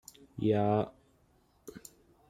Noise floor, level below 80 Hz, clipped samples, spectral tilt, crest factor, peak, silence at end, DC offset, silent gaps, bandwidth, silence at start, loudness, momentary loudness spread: -68 dBFS; -66 dBFS; under 0.1%; -7.5 dB/octave; 20 dB; -16 dBFS; 0.5 s; under 0.1%; none; 15 kHz; 0.35 s; -31 LUFS; 25 LU